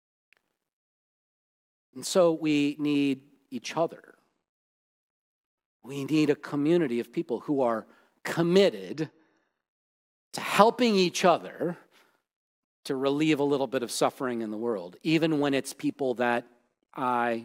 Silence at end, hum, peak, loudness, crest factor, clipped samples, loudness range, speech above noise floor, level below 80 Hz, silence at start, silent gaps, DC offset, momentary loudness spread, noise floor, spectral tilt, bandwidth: 0 s; none; -2 dBFS; -27 LUFS; 26 dB; under 0.1%; 5 LU; 38 dB; -76 dBFS; 1.95 s; 4.49-5.58 s, 5.65-5.80 s, 9.68-10.31 s, 12.36-12.83 s; under 0.1%; 13 LU; -64 dBFS; -5 dB/octave; 16.5 kHz